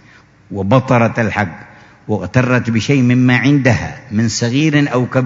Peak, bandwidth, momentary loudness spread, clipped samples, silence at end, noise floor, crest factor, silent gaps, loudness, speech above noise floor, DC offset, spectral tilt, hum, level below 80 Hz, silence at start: 0 dBFS; 7.8 kHz; 10 LU; under 0.1%; 0 s; -45 dBFS; 14 dB; none; -14 LUFS; 32 dB; under 0.1%; -6 dB/octave; none; -46 dBFS; 0.5 s